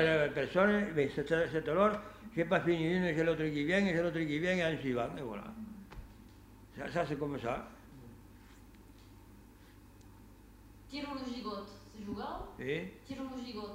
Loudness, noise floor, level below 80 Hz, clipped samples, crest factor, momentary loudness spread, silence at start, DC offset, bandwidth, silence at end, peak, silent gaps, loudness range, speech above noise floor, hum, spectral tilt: -34 LUFS; -57 dBFS; -58 dBFS; under 0.1%; 22 dB; 18 LU; 0 s; under 0.1%; 16 kHz; 0 s; -14 dBFS; none; 15 LU; 23 dB; none; -6.5 dB/octave